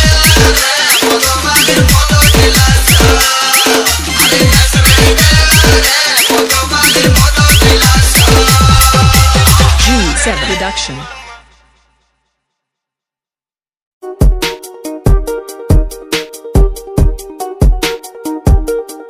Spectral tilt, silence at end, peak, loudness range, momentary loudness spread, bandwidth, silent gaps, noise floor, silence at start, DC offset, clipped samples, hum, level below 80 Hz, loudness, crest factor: -3 dB/octave; 0 s; 0 dBFS; 12 LU; 12 LU; over 20 kHz; 13.82-14.01 s; under -90 dBFS; 0 s; under 0.1%; 2%; none; -14 dBFS; -8 LUFS; 10 dB